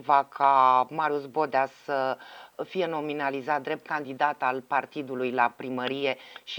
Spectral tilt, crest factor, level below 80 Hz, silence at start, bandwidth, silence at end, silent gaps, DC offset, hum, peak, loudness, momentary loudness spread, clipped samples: -5.5 dB/octave; 20 dB; -80 dBFS; 0 s; 19.5 kHz; 0 s; none; under 0.1%; none; -6 dBFS; -27 LUFS; 11 LU; under 0.1%